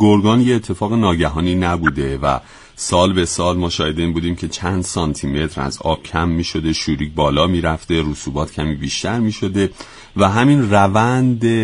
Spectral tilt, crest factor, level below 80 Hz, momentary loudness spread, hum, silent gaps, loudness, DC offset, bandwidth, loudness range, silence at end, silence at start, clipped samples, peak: -5.5 dB/octave; 16 dB; -34 dBFS; 9 LU; none; none; -17 LUFS; under 0.1%; 11 kHz; 3 LU; 0 s; 0 s; under 0.1%; 0 dBFS